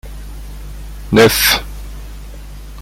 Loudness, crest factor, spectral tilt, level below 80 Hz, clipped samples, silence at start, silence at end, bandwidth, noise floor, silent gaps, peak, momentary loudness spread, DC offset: -11 LUFS; 18 dB; -3.5 dB/octave; -30 dBFS; under 0.1%; 0.05 s; 0 s; 17 kHz; -31 dBFS; none; 0 dBFS; 25 LU; under 0.1%